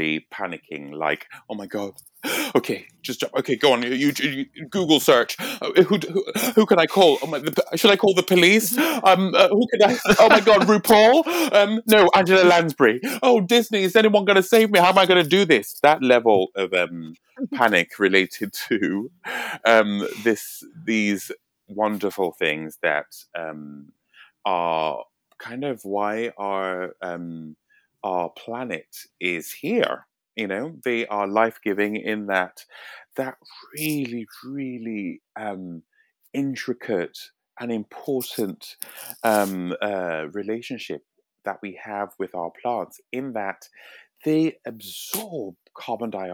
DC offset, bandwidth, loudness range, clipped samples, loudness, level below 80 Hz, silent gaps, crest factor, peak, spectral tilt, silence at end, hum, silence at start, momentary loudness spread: under 0.1%; 19.5 kHz; 14 LU; under 0.1%; -20 LUFS; -64 dBFS; none; 22 dB; 0 dBFS; -4 dB/octave; 0 s; none; 0 s; 19 LU